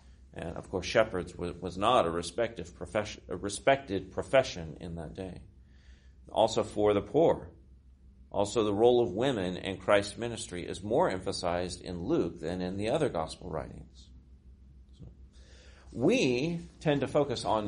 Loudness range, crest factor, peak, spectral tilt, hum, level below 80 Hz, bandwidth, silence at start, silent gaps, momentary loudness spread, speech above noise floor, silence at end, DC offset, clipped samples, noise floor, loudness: 6 LU; 22 dB; -10 dBFS; -5 dB/octave; none; -54 dBFS; 10.5 kHz; 0.05 s; none; 15 LU; 26 dB; 0 s; under 0.1%; under 0.1%; -56 dBFS; -31 LUFS